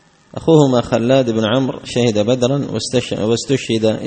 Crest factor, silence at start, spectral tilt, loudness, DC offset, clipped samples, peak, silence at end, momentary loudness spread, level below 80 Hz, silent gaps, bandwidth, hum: 16 dB; 0.35 s; -6 dB/octave; -16 LUFS; under 0.1%; under 0.1%; 0 dBFS; 0 s; 7 LU; -48 dBFS; none; 8.8 kHz; none